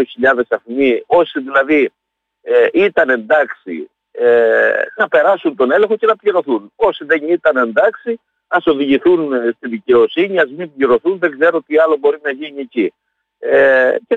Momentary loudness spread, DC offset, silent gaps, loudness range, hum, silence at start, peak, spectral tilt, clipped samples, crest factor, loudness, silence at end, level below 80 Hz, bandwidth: 9 LU; under 0.1%; none; 1 LU; none; 0 s; -2 dBFS; -6.5 dB/octave; under 0.1%; 12 dB; -14 LUFS; 0 s; -58 dBFS; 4.3 kHz